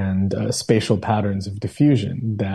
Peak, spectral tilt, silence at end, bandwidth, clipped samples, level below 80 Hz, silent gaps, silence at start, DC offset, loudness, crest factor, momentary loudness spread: -2 dBFS; -6.5 dB/octave; 0 s; 12.5 kHz; under 0.1%; -52 dBFS; none; 0 s; under 0.1%; -21 LUFS; 16 dB; 7 LU